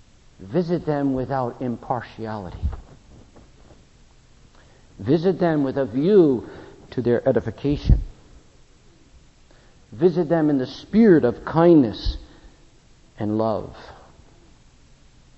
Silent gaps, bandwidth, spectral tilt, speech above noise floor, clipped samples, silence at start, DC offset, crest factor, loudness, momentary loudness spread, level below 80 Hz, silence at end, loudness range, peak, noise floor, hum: none; 8 kHz; -9 dB/octave; 32 dB; under 0.1%; 0.4 s; under 0.1%; 20 dB; -21 LUFS; 17 LU; -36 dBFS; 1.45 s; 11 LU; -4 dBFS; -52 dBFS; none